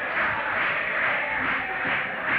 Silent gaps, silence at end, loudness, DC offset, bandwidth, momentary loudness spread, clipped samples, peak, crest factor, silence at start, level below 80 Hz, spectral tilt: none; 0 s; -24 LUFS; under 0.1%; 14 kHz; 2 LU; under 0.1%; -14 dBFS; 12 dB; 0 s; -56 dBFS; -6 dB/octave